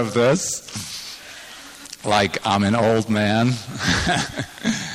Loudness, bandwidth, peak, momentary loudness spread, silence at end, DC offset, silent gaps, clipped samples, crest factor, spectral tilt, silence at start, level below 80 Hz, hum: -21 LUFS; 16 kHz; -6 dBFS; 18 LU; 0 s; under 0.1%; none; under 0.1%; 16 dB; -4.5 dB/octave; 0 s; -44 dBFS; none